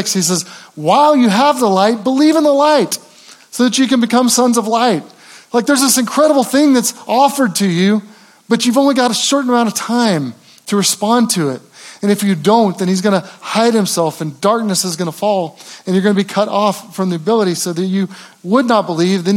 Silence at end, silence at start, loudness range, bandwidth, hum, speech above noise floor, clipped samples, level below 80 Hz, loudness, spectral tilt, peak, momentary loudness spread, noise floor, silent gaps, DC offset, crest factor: 0 s; 0 s; 3 LU; 17 kHz; none; 28 dB; under 0.1%; -70 dBFS; -14 LUFS; -4 dB/octave; 0 dBFS; 8 LU; -41 dBFS; none; under 0.1%; 14 dB